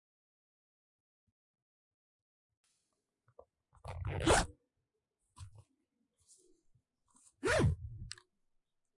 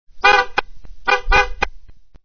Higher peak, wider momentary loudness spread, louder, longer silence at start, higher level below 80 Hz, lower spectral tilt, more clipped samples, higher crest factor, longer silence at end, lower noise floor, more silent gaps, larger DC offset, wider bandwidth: second, -16 dBFS vs 0 dBFS; first, 26 LU vs 12 LU; second, -34 LUFS vs -17 LUFS; first, 3.85 s vs 0.05 s; second, -52 dBFS vs -30 dBFS; first, -4.5 dB/octave vs -2.5 dB/octave; neither; first, 26 dB vs 18 dB; first, 0.9 s vs 0 s; first, -87 dBFS vs -40 dBFS; neither; second, under 0.1% vs 3%; first, 11.5 kHz vs 6.6 kHz